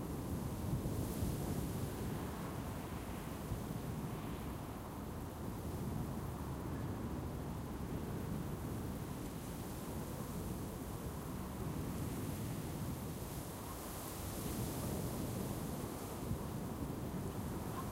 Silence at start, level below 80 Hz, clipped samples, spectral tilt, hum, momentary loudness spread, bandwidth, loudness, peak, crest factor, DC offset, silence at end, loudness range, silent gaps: 0 s; -52 dBFS; under 0.1%; -6 dB/octave; none; 4 LU; 16.5 kHz; -43 LUFS; -26 dBFS; 16 dB; under 0.1%; 0 s; 2 LU; none